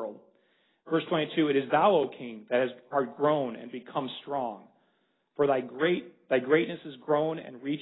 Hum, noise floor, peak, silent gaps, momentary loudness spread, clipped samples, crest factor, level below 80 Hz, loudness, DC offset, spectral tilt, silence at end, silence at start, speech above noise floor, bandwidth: none; -73 dBFS; -10 dBFS; none; 13 LU; under 0.1%; 20 dB; -78 dBFS; -29 LUFS; under 0.1%; -10 dB/octave; 0 s; 0 s; 44 dB; 4.1 kHz